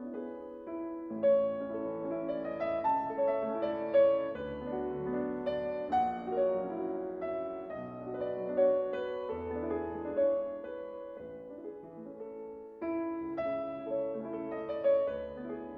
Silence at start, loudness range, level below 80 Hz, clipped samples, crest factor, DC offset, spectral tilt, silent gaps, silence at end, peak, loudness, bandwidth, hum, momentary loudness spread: 0 s; 6 LU; -64 dBFS; under 0.1%; 16 dB; under 0.1%; -9 dB/octave; none; 0 s; -16 dBFS; -34 LUFS; 4.9 kHz; none; 16 LU